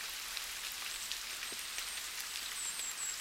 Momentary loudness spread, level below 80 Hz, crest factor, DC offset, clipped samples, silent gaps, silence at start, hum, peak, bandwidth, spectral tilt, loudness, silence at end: 2 LU; -68 dBFS; 24 dB; under 0.1%; under 0.1%; none; 0 s; none; -18 dBFS; 16.5 kHz; 2.5 dB/octave; -39 LUFS; 0 s